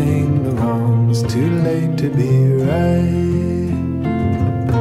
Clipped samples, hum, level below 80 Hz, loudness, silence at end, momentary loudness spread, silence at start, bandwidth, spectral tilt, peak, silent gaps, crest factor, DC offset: under 0.1%; none; -36 dBFS; -17 LUFS; 0 s; 5 LU; 0 s; 13 kHz; -8.5 dB/octave; -6 dBFS; none; 10 dB; under 0.1%